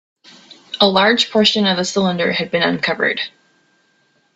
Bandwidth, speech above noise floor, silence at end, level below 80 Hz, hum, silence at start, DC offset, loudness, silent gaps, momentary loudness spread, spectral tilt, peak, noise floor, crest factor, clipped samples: 8.2 kHz; 44 dB; 1.1 s; -60 dBFS; none; 0.7 s; under 0.1%; -15 LUFS; none; 7 LU; -4 dB/octave; 0 dBFS; -60 dBFS; 18 dB; under 0.1%